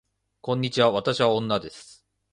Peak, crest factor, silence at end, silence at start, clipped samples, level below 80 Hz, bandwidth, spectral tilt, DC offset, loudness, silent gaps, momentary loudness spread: -6 dBFS; 20 dB; 0.5 s; 0.45 s; under 0.1%; -60 dBFS; 11 kHz; -5.5 dB/octave; under 0.1%; -24 LUFS; none; 18 LU